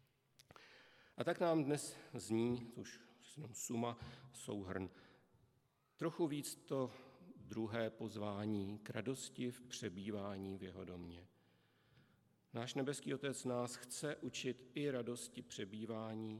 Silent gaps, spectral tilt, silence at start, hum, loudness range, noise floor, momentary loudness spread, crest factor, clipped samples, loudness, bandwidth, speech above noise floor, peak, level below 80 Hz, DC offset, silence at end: none; -5 dB/octave; 0.55 s; none; 6 LU; -79 dBFS; 15 LU; 22 dB; under 0.1%; -44 LUFS; 15.5 kHz; 35 dB; -24 dBFS; -82 dBFS; under 0.1%; 0 s